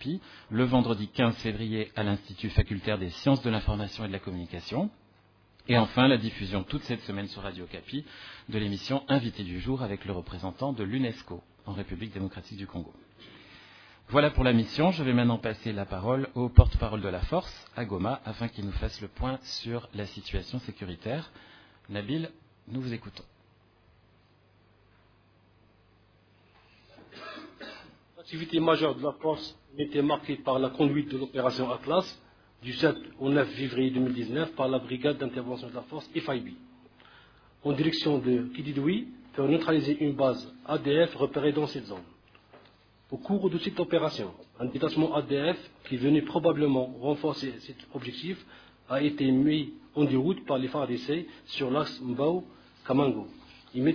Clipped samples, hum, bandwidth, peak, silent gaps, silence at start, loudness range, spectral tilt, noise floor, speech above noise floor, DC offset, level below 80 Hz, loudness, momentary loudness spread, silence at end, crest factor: under 0.1%; none; 5.4 kHz; 0 dBFS; none; 0 s; 9 LU; -7.5 dB/octave; -63 dBFS; 34 dB; under 0.1%; -42 dBFS; -29 LUFS; 15 LU; 0 s; 28 dB